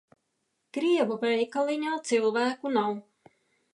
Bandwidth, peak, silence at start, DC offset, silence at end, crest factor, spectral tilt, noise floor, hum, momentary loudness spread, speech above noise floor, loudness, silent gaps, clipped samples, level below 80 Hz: 11.5 kHz; -12 dBFS; 0.75 s; under 0.1%; 0.7 s; 16 dB; -4 dB/octave; -78 dBFS; none; 6 LU; 51 dB; -27 LUFS; none; under 0.1%; -86 dBFS